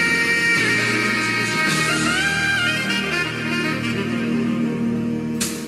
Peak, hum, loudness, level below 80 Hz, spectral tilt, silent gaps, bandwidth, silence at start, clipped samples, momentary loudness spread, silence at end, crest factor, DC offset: -6 dBFS; none; -19 LUFS; -50 dBFS; -3.5 dB/octave; none; 13.5 kHz; 0 s; under 0.1%; 7 LU; 0 s; 14 dB; under 0.1%